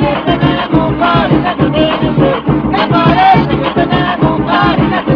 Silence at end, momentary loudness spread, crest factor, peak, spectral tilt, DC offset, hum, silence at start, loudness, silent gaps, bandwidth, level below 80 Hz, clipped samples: 0 s; 4 LU; 10 dB; 0 dBFS; -9 dB/octave; under 0.1%; none; 0 s; -11 LUFS; none; 5.4 kHz; -30 dBFS; 0.3%